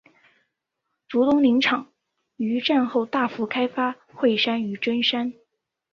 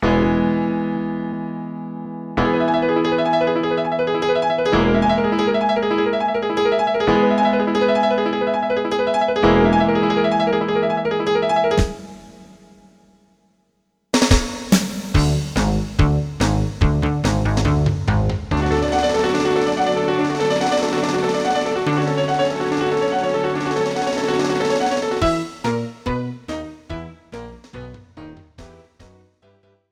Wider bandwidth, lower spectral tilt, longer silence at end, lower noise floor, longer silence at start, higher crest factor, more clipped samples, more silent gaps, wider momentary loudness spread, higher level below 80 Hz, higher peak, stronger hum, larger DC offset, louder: second, 7 kHz vs 17 kHz; about the same, -5.5 dB/octave vs -6 dB/octave; second, 0.6 s vs 1.25 s; first, -80 dBFS vs -67 dBFS; first, 1.1 s vs 0 s; about the same, 16 dB vs 16 dB; neither; neither; about the same, 9 LU vs 10 LU; second, -68 dBFS vs -32 dBFS; second, -8 dBFS vs -2 dBFS; neither; neither; second, -23 LUFS vs -19 LUFS